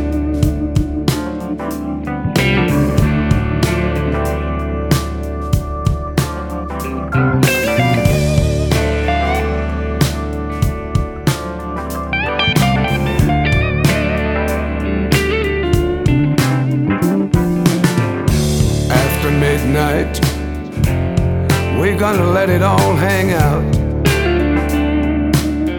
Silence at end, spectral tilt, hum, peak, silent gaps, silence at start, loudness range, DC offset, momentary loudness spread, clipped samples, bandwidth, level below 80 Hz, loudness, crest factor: 0 s; -6 dB/octave; none; 0 dBFS; none; 0 s; 4 LU; under 0.1%; 7 LU; under 0.1%; 18.5 kHz; -24 dBFS; -16 LUFS; 14 dB